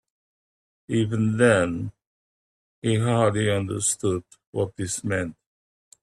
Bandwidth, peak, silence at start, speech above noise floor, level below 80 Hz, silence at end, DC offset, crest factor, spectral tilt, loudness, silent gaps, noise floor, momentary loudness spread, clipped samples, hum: 12.5 kHz; -4 dBFS; 0.9 s; over 67 dB; -58 dBFS; 0.7 s; under 0.1%; 22 dB; -5 dB/octave; -24 LUFS; 2.07-2.82 s, 4.47-4.53 s; under -90 dBFS; 12 LU; under 0.1%; none